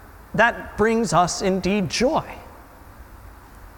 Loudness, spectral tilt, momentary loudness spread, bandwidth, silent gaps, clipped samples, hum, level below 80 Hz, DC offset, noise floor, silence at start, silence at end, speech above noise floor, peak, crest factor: -21 LUFS; -4.5 dB/octave; 9 LU; 18 kHz; none; under 0.1%; none; -44 dBFS; under 0.1%; -44 dBFS; 0 s; 0.05 s; 24 dB; -4 dBFS; 20 dB